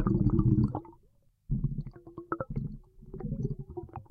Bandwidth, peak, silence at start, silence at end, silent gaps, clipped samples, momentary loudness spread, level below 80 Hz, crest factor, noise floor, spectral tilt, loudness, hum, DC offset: 4.8 kHz; -14 dBFS; 0 s; 0.05 s; none; under 0.1%; 19 LU; -42 dBFS; 18 dB; -65 dBFS; -12 dB/octave; -32 LUFS; none; under 0.1%